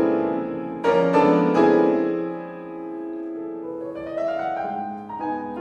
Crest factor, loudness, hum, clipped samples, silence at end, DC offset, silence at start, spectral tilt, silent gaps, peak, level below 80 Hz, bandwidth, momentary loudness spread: 16 dB; -23 LUFS; none; under 0.1%; 0 s; under 0.1%; 0 s; -8 dB/octave; none; -6 dBFS; -60 dBFS; 8.4 kHz; 14 LU